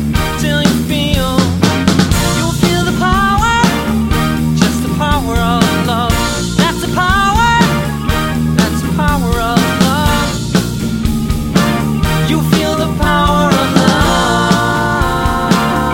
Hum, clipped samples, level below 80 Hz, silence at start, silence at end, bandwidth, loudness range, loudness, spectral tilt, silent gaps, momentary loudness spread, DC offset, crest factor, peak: none; under 0.1%; -22 dBFS; 0 s; 0 s; 17 kHz; 2 LU; -13 LUFS; -5 dB/octave; none; 4 LU; under 0.1%; 12 dB; 0 dBFS